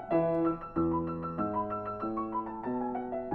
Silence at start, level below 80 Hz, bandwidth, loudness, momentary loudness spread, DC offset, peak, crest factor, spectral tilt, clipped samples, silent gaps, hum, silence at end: 0 s; -56 dBFS; 4.3 kHz; -33 LUFS; 6 LU; under 0.1%; -16 dBFS; 16 dB; -11.5 dB/octave; under 0.1%; none; none; 0 s